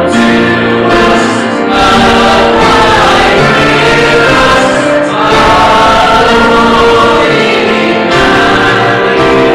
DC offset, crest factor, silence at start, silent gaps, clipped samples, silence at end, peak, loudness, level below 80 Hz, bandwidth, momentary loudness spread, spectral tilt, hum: under 0.1%; 6 dB; 0 s; none; under 0.1%; 0 s; 0 dBFS; -6 LUFS; -26 dBFS; 15.5 kHz; 3 LU; -4.5 dB/octave; none